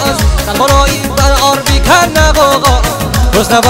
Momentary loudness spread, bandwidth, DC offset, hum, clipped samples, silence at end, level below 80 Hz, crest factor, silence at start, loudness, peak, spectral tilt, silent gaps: 5 LU; 16.5 kHz; under 0.1%; none; 1%; 0 s; -14 dBFS; 8 dB; 0 s; -9 LUFS; 0 dBFS; -4 dB/octave; none